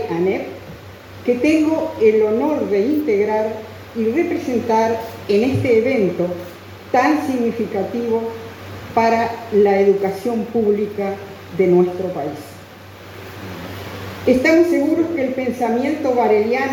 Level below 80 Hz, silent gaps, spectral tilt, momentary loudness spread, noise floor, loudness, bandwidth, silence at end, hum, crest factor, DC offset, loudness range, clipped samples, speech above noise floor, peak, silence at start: -54 dBFS; none; -6.5 dB/octave; 18 LU; -38 dBFS; -18 LUFS; 18.5 kHz; 0 s; none; 16 dB; under 0.1%; 3 LU; under 0.1%; 21 dB; -2 dBFS; 0 s